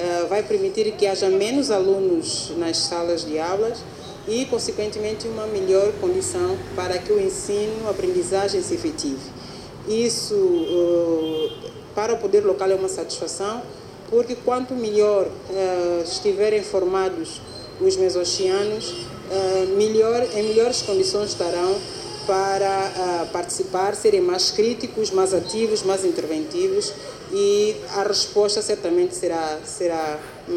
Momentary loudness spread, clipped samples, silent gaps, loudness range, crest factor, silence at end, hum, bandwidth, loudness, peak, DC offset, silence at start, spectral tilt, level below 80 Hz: 9 LU; under 0.1%; none; 3 LU; 16 dB; 0 s; none; 14 kHz; -22 LUFS; -6 dBFS; under 0.1%; 0 s; -3.5 dB/octave; -54 dBFS